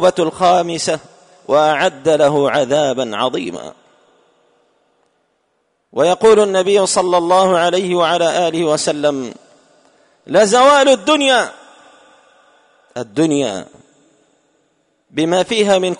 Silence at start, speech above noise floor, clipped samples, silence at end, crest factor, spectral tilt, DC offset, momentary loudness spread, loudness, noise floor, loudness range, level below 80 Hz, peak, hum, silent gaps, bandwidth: 0 s; 52 dB; under 0.1%; 0.05 s; 14 dB; -3.5 dB/octave; under 0.1%; 14 LU; -14 LUFS; -65 dBFS; 9 LU; -58 dBFS; -2 dBFS; none; none; 11 kHz